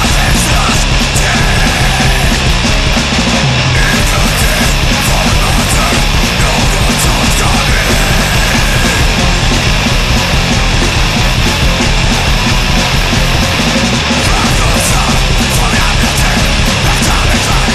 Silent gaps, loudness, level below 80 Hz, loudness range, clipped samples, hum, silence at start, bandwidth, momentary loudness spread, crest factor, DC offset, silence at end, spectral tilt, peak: none; -10 LUFS; -14 dBFS; 1 LU; under 0.1%; none; 0 s; 14 kHz; 1 LU; 10 dB; under 0.1%; 0 s; -3.5 dB/octave; 0 dBFS